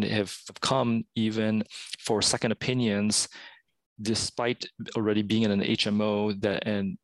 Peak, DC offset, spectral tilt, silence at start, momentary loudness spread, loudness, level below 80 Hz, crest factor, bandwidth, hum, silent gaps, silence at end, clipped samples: -10 dBFS; under 0.1%; -4 dB/octave; 0 s; 9 LU; -27 LUFS; -62 dBFS; 18 dB; 12.5 kHz; none; 3.86-3.96 s; 0.1 s; under 0.1%